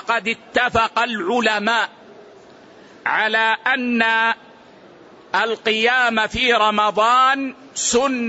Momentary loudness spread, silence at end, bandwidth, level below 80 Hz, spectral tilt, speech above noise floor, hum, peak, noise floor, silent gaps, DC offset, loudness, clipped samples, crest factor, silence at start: 7 LU; 0 s; 8.2 kHz; -50 dBFS; -2 dB/octave; 27 dB; none; -4 dBFS; -45 dBFS; none; under 0.1%; -18 LUFS; under 0.1%; 16 dB; 0.05 s